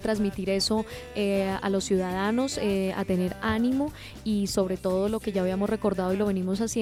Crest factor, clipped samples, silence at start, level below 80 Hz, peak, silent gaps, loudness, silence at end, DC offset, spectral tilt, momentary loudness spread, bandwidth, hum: 14 dB; under 0.1%; 0 s; -48 dBFS; -12 dBFS; none; -27 LUFS; 0 s; under 0.1%; -5.5 dB/octave; 3 LU; 16 kHz; none